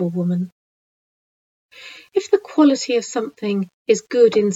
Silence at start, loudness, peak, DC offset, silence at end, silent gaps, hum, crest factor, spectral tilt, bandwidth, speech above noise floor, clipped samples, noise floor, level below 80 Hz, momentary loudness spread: 0 s; -19 LUFS; -4 dBFS; under 0.1%; 0 s; 0.52-1.69 s, 3.74-3.85 s; none; 16 dB; -5.5 dB/octave; 8 kHz; over 71 dB; under 0.1%; under -90 dBFS; -70 dBFS; 11 LU